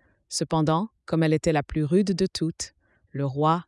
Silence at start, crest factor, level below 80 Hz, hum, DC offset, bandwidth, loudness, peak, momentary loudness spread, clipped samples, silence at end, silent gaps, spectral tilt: 0.3 s; 16 dB; -52 dBFS; none; under 0.1%; 12 kHz; -25 LUFS; -10 dBFS; 9 LU; under 0.1%; 0.05 s; none; -6 dB/octave